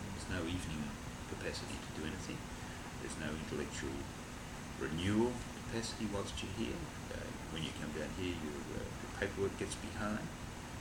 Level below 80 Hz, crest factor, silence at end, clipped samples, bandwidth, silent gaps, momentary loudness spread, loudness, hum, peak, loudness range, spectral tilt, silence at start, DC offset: -54 dBFS; 18 dB; 0 s; under 0.1%; 20 kHz; none; 8 LU; -42 LUFS; none; -22 dBFS; 3 LU; -4.5 dB/octave; 0 s; under 0.1%